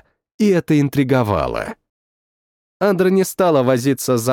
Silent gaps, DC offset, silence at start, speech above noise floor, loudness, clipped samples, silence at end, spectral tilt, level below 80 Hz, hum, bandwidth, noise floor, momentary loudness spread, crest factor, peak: 1.89-2.80 s; under 0.1%; 0.4 s; over 74 dB; -17 LUFS; under 0.1%; 0 s; -6 dB/octave; -46 dBFS; none; 18 kHz; under -90 dBFS; 6 LU; 14 dB; -4 dBFS